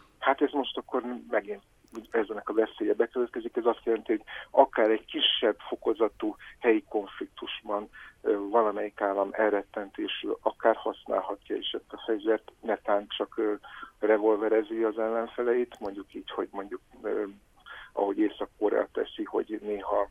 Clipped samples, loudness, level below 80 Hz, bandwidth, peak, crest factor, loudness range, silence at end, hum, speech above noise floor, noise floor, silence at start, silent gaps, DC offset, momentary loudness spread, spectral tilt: under 0.1%; -29 LUFS; -64 dBFS; 3.8 kHz; -6 dBFS; 24 dB; 5 LU; 0.05 s; none; 19 dB; -49 dBFS; 0.2 s; none; under 0.1%; 13 LU; -5.5 dB/octave